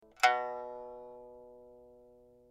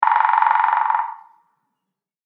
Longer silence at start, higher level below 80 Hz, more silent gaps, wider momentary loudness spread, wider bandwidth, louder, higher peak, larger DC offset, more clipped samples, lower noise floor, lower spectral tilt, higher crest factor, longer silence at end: first, 0.2 s vs 0 s; first, -74 dBFS vs under -90 dBFS; neither; first, 26 LU vs 7 LU; first, 14.5 kHz vs 5 kHz; second, -33 LUFS vs -17 LUFS; second, -12 dBFS vs -2 dBFS; neither; neither; second, -60 dBFS vs -82 dBFS; about the same, -0.5 dB/octave vs 0 dB/octave; first, 26 dB vs 18 dB; second, 0.65 s vs 1.1 s